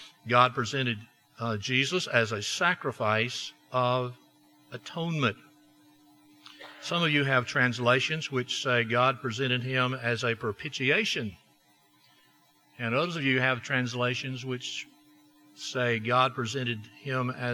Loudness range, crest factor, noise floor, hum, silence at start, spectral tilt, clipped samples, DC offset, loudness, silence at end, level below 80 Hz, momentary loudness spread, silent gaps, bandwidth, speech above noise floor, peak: 5 LU; 24 dB; -64 dBFS; none; 0 s; -4.5 dB/octave; under 0.1%; under 0.1%; -28 LUFS; 0 s; -74 dBFS; 12 LU; none; 13 kHz; 36 dB; -6 dBFS